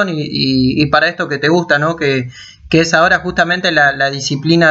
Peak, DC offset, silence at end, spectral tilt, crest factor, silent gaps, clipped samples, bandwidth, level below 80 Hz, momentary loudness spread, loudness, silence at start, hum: 0 dBFS; under 0.1%; 0 s; -5 dB/octave; 14 dB; none; under 0.1%; 8 kHz; -42 dBFS; 5 LU; -13 LUFS; 0 s; none